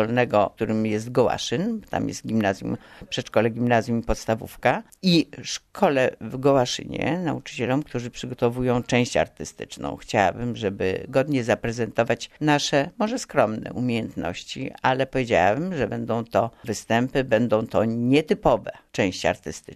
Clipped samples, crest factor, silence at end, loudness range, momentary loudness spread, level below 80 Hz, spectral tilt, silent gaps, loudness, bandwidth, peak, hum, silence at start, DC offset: under 0.1%; 20 dB; 0 s; 2 LU; 10 LU; -48 dBFS; -5.5 dB/octave; none; -24 LUFS; 13.5 kHz; -4 dBFS; none; 0 s; under 0.1%